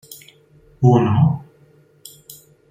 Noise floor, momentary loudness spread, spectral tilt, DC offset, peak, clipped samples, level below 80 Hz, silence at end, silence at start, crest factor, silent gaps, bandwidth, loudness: -52 dBFS; 26 LU; -8.5 dB/octave; under 0.1%; -2 dBFS; under 0.1%; -54 dBFS; 1.3 s; 0.1 s; 18 dB; none; 16 kHz; -17 LUFS